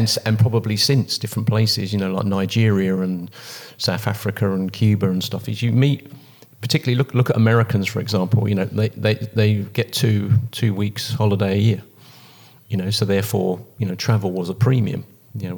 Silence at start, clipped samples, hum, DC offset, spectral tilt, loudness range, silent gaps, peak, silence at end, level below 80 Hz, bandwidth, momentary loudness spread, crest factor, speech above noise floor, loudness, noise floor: 0 s; under 0.1%; none; under 0.1%; -6 dB/octave; 3 LU; none; -2 dBFS; 0 s; -64 dBFS; 19 kHz; 8 LU; 16 dB; 28 dB; -20 LUFS; -47 dBFS